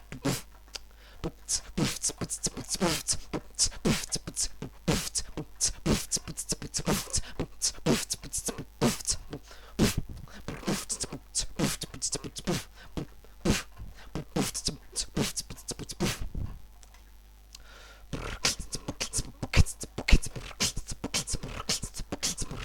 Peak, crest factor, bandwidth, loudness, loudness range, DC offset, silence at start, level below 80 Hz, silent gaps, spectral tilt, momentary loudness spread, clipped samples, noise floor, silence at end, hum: -4 dBFS; 28 dB; 17.5 kHz; -31 LUFS; 5 LU; under 0.1%; 0 s; -40 dBFS; none; -3 dB/octave; 14 LU; under 0.1%; -52 dBFS; 0 s; none